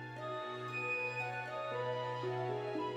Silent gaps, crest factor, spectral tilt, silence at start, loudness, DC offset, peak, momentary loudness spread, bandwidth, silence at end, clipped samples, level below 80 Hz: none; 12 dB; -6 dB/octave; 0 s; -39 LUFS; under 0.1%; -26 dBFS; 6 LU; 11.5 kHz; 0 s; under 0.1%; -78 dBFS